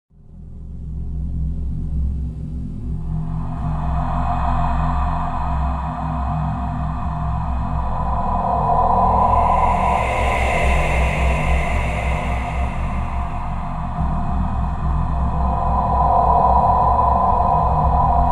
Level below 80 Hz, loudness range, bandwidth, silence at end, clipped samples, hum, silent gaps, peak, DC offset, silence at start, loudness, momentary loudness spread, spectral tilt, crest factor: -22 dBFS; 7 LU; 10.5 kHz; 0 s; under 0.1%; none; none; -4 dBFS; under 0.1%; 0.3 s; -20 LUFS; 11 LU; -7.5 dB/octave; 16 dB